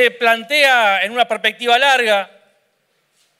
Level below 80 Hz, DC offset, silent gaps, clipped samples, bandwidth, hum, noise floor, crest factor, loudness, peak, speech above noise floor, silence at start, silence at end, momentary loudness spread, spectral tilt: -70 dBFS; under 0.1%; none; under 0.1%; 16 kHz; none; -64 dBFS; 14 dB; -14 LUFS; -2 dBFS; 50 dB; 0 s; 1.15 s; 6 LU; -1 dB/octave